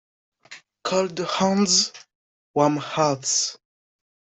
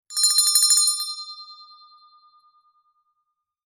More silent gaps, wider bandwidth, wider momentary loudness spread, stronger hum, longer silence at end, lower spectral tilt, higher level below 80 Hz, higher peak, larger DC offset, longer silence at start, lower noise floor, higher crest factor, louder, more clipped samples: first, 2.15-2.54 s vs none; second, 8.4 kHz vs 19 kHz; second, 9 LU vs 21 LU; neither; second, 0.65 s vs 2.1 s; first, -3 dB/octave vs 7 dB/octave; first, -68 dBFS vs -84 dBFS; second, -6 dBFS vs -2 dBFS; neither; first, 0.5 s vs 0.1 s; second, -48 dBFS vs -77 dBFS; about the same, 20 dB vs 22 dB; second, -22 LUFS vs -17 LUFS; neither